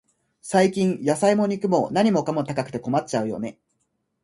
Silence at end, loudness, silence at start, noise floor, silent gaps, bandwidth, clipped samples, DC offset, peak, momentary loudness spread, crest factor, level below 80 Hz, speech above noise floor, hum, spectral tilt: 0.7 s; -22 LUFS; 0.45 s; -73 dBFS; none; 11.5 kHz; under 0.1%; under 0.1%; -6 dBFS; 9 LU; 18 dB; -62 dBFS; 52 dB; none; -6 dB/octave